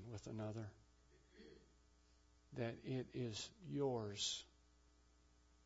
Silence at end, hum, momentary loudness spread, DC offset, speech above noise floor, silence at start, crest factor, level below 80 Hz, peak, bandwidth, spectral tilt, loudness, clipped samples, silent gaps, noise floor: 1.15 s; none; 21 LU; under 0.1%; 26 dB; 0 s; 20 dB; -72 dBFS; -30 dBFS; 7.6 kHz; -5 dB/octave; -47 LUFS; under 0.1%; none; -72 dBFS